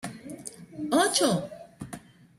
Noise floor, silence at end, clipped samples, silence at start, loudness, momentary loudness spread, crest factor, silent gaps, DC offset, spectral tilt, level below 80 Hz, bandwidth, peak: -46 dBFS; 0.4 s; under 0.1%; 0.05 s; -25 LUFS; 20 LU; 20 dB; none; under 0.1%; -3.5 dB/octave; -64 dBFS; 16 kHz; -10 dBFS